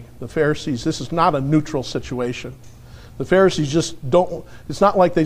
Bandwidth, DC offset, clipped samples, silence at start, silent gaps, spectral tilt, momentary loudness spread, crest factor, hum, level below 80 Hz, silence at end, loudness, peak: 15 kHz; under 0.1%; under 0.1%; 0 s; none; -6 dB/octave; 14 LU; 18 dB; none; -42 dBFS; 0 s; -19 LUFS; -2 dBFS